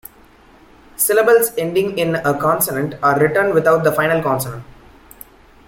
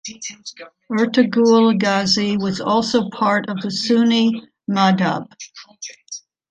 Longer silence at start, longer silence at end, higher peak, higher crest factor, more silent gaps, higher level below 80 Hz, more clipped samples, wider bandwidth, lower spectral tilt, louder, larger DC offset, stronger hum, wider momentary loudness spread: first, 1 s vs 0.05 s; first, 1.05 s vs 0.3 s; about the same, -2 dBFS vs -2 dBFS; about the same, 16 dB vs 16 dB; neither; first, -50 dBFS vs -62 dBFS; neither; first, 17 kHz vs 9.2 kHz; about the same, -4.5 dB/octave vs -5 dB/octave; about the same, -16 LUFS vs -17 LUFS; neither; neither; second, 6 LU vs 20 LU